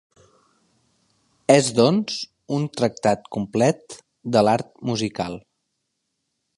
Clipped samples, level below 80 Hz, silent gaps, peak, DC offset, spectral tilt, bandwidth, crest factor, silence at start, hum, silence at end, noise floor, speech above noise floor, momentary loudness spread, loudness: under 0.1%; -60 dBFS; none; -2 dBFS; under 0.1%; -5 dB/octave; 11.5 kHz; 22 dB; 1.5 s; none; 1.2 s; -76 dBFS; 56 dB; 14 LU; -22 LUFS